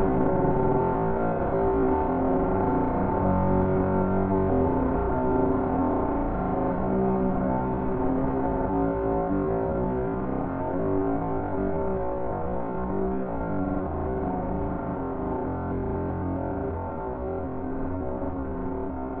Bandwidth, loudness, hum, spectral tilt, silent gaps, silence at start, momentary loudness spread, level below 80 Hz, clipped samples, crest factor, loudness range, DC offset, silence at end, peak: 3.6 kHz; -27 LUFS; none; -13 dB/octave; none; 0 s; 7 LU; -38 dBFS; under 0.1%; 14 dB; 6 LU; under 0.1%; 0 s; -10 dBFS